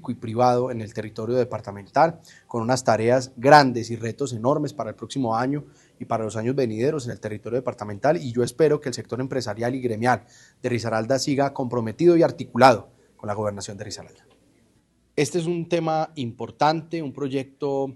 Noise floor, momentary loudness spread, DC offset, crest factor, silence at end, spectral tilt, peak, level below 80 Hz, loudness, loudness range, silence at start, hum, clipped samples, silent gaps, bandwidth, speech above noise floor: -63 dBFS; 14 LU; under 0.1%; 24 dB; 0 s; -5.5 dB/octave; 0 dBFS; -62 dBFS; -23 LUFS; 6 LU; 0.05 s; none; under 0.1%; none; 12.5 kHz; 40 dB